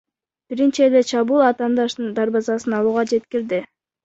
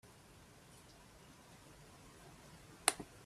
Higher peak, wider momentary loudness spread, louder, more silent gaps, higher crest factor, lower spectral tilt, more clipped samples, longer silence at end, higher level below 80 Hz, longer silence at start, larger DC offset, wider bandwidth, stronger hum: first, -4 dBFS vs -8 dBFS; second, 8 LU vs 24 LU; first, -19 LUFS vs -37 LUFS; neither; second, 16 dB vs 40 dB; first, -5 dB/octave vs -1 dB/octave; neither; first, 0.4 s vs 0 s; first, -64 dBFS vs -70 dBFS; first, 0.5 s vs 0.05 s; neither; second, 8 kHz vs 15.5 kHz; neither